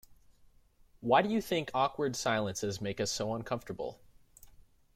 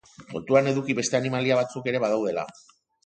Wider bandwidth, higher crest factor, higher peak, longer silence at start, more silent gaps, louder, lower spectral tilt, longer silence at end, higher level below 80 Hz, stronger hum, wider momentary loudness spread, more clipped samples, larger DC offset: first, 16.5 kHz vs 9.4 kHz; about the same, 22 dB vs 20 dB; second, -12 dBFS vs -6 dBFS; first, 1 s vs 0.2 s; neither; second, -33 LUFS vs -25 LUFS; about the same, -4 dB/octave vs -5 dB/octave; about the same, 0.5 s vs 0.55 s; about the same, -62 dBFS vs -66 dBFS; neither; about the same, 13 LU vs 13 LU; neither; neither